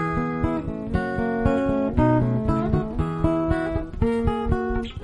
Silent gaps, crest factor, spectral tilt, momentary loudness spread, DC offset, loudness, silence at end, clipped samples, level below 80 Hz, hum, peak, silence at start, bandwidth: none; 16 dB; -9 dB/octave; 6 LU; under 0.1%; -24 LUFS; 0 s; under 0.1%; -32 dBFS; none; -6 dBFS; 0 s; 10.5 kHz